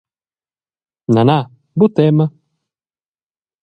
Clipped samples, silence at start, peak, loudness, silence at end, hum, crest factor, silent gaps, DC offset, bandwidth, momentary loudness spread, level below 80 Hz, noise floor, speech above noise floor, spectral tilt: under 0.1%; 1.1 s; 0 dBFS; -15 LUFS; 1.35 s; none; 18 dB; none; under 0.1%; 6.4 kHz; 10 LU; -58 dBFS; under -90 dBFS; over 78 dB; -9.5 dB/octave